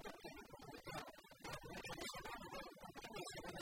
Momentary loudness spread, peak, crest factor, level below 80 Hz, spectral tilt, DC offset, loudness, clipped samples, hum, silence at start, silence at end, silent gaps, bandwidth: 7 LU; -36 dBFS; 16 dB; -68 dBFS; -3.5 dB/octave; under 0.1%; -52 LUFS; under 0.1%; none; 0 s; 0 s; none; 16 kHz